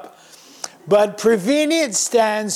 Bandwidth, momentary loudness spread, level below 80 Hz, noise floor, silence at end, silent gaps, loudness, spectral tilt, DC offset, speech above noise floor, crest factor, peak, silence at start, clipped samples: 16 kHz; 17 LU; -64 dBFS; -45 dBFS; 0 s; none; -17 LUFS; -3 dB/octave; under 0.1%; 28 dB; 12 dB; -6 dBFS; 0 s; under 0.1%